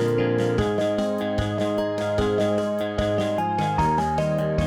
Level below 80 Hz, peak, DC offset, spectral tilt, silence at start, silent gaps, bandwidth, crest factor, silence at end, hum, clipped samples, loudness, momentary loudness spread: -40 dBFS; -10 dBFS; under 0.1%; -7 dB/octave; 0 s; none; 16.5 kHz; 12 dB; 0 s; none; under 0.1%; -23 LUFS; 3 LU